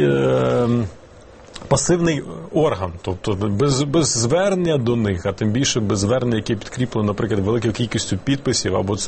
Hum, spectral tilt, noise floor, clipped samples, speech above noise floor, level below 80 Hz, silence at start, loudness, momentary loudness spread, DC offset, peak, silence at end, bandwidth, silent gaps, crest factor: none; -5 dB/octave; -43 dBFS; under 0.1%; 24 dB; -42 dBFS; 0 s; -20 LUFS; 7 LU; 0.1%; -2 dBFS; 0 s; 8.8 kHz; none; 18 dB